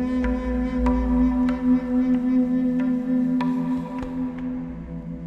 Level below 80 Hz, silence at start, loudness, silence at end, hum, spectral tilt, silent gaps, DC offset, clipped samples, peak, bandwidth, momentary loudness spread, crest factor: -34 dBFS; 0 s; -23 LUFS; 0 s; none; -9 dB/octave; none; under 0.1%; under 0.1%; -10 dBFS; 5.4 kHz; 9 LU; 12 dB